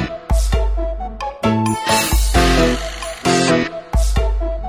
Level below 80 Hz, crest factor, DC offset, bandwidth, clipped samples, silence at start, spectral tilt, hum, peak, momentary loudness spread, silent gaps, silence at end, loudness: -20 dBFS; 16 dB; 0.1%; 16 kHz; under 0.1%; 0 s; -4.5 dB/octave; none; -2 dBFS; 9 LU; none; 0 s; -18 LUFS